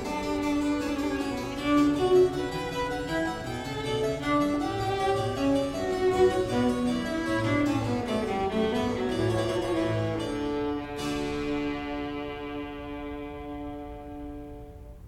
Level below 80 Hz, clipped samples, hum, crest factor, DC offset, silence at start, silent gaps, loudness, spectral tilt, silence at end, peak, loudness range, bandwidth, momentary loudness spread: -46 dBFS; under 0.1%; none; 16 dB; under 0.1%; 0 s; none; -28 LUFS; -6 dB/octave; 0 s; -12 dBFS; 7 LU; 15 kHz; 14 LU